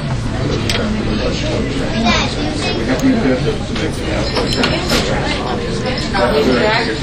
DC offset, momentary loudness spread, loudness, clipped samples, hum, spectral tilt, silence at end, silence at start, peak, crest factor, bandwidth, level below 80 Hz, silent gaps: under 0.1%; 6 LU; -16 LUFS; under 0.1%; none; -5 dB/octave; 0 s; 0 s; 0 dBFS; 16 dB; 15.5 kHz; -26 dBFS; none